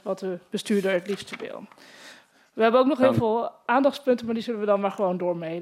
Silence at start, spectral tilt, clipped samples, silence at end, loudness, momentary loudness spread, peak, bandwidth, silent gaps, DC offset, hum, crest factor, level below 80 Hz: 0.05 s; -6 dB/octave; under 0.1%; 0 s; -24 LUFS; 14 LU; -8 dBFS; 14.5 kHz; none; under 0.1%; none; 18 dB; -68 dBFS